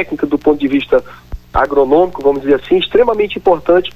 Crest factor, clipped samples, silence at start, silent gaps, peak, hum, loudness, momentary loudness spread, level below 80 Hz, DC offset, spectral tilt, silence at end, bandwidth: 12 dB; under 0.1%; 0 s; none; 0 dBFS; 60 Hz at -40 dBFS; -13 LUFS; 5 LU; -34 dBFS; under 0.1%; -7 dB/octave; 0.05 s; 13 kHz